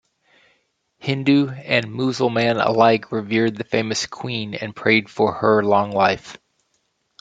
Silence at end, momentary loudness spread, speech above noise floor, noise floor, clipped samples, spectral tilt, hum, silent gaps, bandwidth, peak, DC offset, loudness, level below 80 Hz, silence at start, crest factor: 0.85 s; 10 LU; 50 dB; -69 dBFS; under 0.1%; -5.5 dB/octave; none; none; 9.2 kHz; -2 dBFS; under 0.1%; -19 LUFS; -62 dBFS; 1.05 s; 18 dB